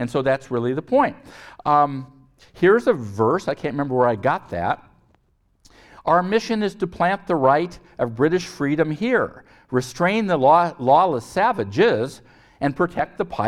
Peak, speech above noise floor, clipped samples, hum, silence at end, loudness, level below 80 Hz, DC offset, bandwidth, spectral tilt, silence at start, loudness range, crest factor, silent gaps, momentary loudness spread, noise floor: -2 dBFS; 43 dB; under 0.1%; none; 0 s; -21 LUFS; -54 dBFS; under 0.1%; 13 kHz; -6.5 dB/octave; 0 s; 4 LU; 18 dB; none; 9 LU; -63 dBFS